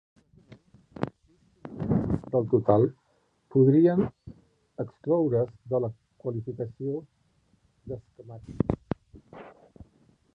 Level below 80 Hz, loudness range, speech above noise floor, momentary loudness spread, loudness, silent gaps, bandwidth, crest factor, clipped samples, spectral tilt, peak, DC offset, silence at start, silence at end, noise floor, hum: -52 dBFS; 11 LU; 44 dB; 23 LU; -27 LUFS; none; 5.2 kHz; 22 dB; under 0.1%; -11.5 dB/octave; -8 dBFS; under 0.1%; 0.5 s; 0.85 s; -69 dBFS; none